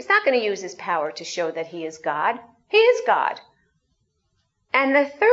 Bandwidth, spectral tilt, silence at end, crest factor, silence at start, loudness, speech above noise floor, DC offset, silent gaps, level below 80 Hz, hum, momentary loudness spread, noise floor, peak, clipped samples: 8 kHz; -3 dB/octave; 0 s; 18 dB; 0 s; -22 LUFS; 50 dB; under 0.1%; none; -76 dBFS; none; 12 LU; -71 dBFS; -4 dBFS; under 0.1%